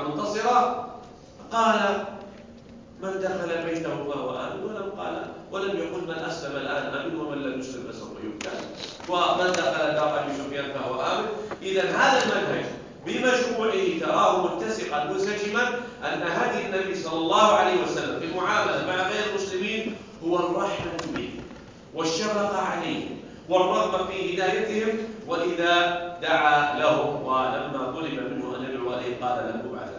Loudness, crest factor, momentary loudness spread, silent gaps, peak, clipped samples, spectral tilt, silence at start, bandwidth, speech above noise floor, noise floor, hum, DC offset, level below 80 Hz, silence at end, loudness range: -26 LUFS; 20 dB; 13 LU; none; -6 dBFS; under 0.1%; -4 dB/octave; 0 s; 7.6 kHz; 21 dB; -46 dBFS; none; under 0.1%; -58 dBFS; 0 s; 7 LU